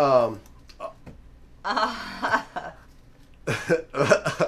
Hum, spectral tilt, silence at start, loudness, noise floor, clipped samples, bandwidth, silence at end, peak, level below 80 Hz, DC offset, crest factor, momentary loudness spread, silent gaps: none; -4.5 dB/octave; 0 s; -25 LUFS; -50 dBFS; under 0.1%; 14 kHz; 0 s; -4 dBFS; -52 dBFS; under 0.1%; 22 dB; 18 LU; none